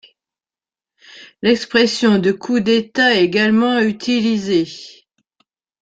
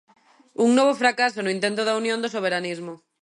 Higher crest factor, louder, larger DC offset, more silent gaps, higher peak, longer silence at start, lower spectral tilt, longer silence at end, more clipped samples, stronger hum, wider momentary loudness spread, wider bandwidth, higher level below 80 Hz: about the same, 16 dB vs 18 dB; first, -16 LUFS vs -22 LUFS; neither; neither; first, -2 dBFS vs -6 dBFS; first, 1.15 s vs 0.6 s; about the same, -5 dB/octave vs -4 dB/octave; first, 0.9 s vs 0.25 s; neither; neither; second, 5 LU vs 14 LU; second, 9 kHz vs 11 kHz; first, -58 dBFS vs -76 dBFS